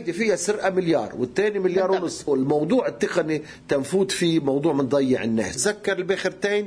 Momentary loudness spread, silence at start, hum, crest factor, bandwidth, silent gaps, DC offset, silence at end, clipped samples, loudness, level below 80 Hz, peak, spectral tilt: 4 LU; 0 s; none; 14 dB; 11 kHz; none; under 0.1%; 0 s; under 0.1%; -23 LUFS; -58 dBFS; -8 dBFS; -4.5 dB/octave